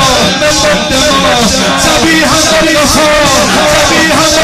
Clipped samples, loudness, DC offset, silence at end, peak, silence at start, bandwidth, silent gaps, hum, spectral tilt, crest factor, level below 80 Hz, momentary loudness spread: 0.4%; -6 LUFS; under 0.1%; 0 s; 0 dBFS; 0 s; 16.5 kHz; none; none; -2.5 dB/octave; 8 dB; -26 dBFS; 2 LU